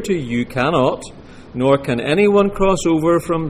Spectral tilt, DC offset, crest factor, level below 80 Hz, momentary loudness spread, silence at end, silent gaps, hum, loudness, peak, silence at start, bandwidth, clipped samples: -6 dB/octave; under 0.1%; 14 dB; -38 dBFS; 8 LU; 0 s; none; none; -17 LUFS; -4 dBFS; 0 s; 15.5 kHz; under 0.1%